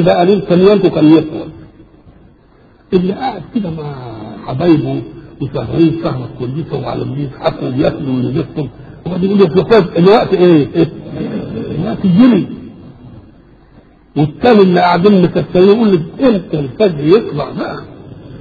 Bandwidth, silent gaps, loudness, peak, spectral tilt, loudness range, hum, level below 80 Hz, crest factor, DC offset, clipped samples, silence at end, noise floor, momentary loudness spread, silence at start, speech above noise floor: 6.8 kHz; none; -12 LUFS; 0 dBFS; -9.5 dB/octave; 7 LU; none; -42 dBFS; 12 dB; under 0.1%; under 0.1%; 0 s; -45 dBFS; 15 LU; 0 s; 34 dB